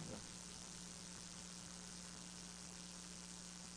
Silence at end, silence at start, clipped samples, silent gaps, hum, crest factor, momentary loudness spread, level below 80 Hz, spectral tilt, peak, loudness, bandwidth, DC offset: 0 s; 0 s; under 0.1%; none; none; 18 dB; 1 LU; -68 dBFS; -2.5 dB/octave; -36 dBFS; -52 LUFS; 10.5 kHz; under 0.1%